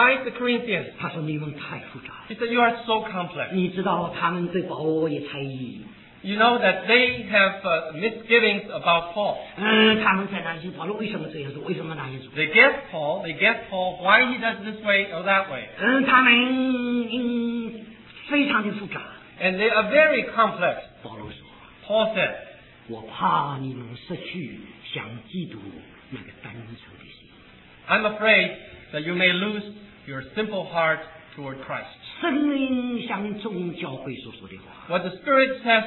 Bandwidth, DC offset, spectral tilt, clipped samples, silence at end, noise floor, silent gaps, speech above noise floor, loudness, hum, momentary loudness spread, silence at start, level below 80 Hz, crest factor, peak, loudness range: 4.3 kHz; under 0.1%; -8 dB/octave; under 0.1%; 0 s; -50 dBFS; none; 26 dB; -22 LUFS; none; 21 LU; 0 s; -60 dBFS; 22 dB; -2 dBFS; 8 LU